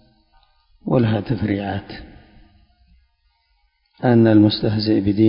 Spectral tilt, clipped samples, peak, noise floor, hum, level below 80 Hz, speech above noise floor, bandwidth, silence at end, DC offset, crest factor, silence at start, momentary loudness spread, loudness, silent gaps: -12 dB/octave; under 0.1%; -2 dBFS; -64 dBFS; none; -46 dBFS; 48 dB; 5.4 kHz; 0 s; under 0.1%; 18 dB; 0.85 s; 18 LU; -18 LUFS; none